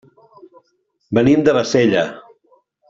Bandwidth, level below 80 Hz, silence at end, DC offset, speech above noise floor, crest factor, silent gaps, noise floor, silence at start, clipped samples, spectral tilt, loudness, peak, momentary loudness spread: 7.8 kHz; -52 dBFS; 0.7 s; under 0.1%; 52 dB; 16 dB; none; -66 dBFS; 1.1 s; under 0.1%; -6 dB/octave; -16 LUFS; -2 dBFS; 8 LU